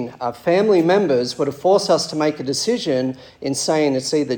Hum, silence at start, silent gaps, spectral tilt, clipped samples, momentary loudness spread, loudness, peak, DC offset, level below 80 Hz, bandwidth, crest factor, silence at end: none; 0 s; none; -4.5 dB/octave; under 0.1%; 9 LU; -19 LUFS; -4 dBFS; under 0.1%; -62 dBFS; 18 kHz; 16 dB; 0 s